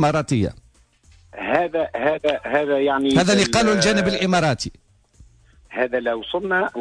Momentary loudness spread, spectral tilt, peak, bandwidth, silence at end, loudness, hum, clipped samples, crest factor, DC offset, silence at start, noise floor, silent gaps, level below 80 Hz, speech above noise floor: 9 LU; -4.5 dB/octave; -4 dBFS; 11 kHz; 0 s; -20 LUFS; none; under 0.1%; 16 dB; under 0.1%; 0 s; -54 dBFS; none; -46 dBFS; 35 dB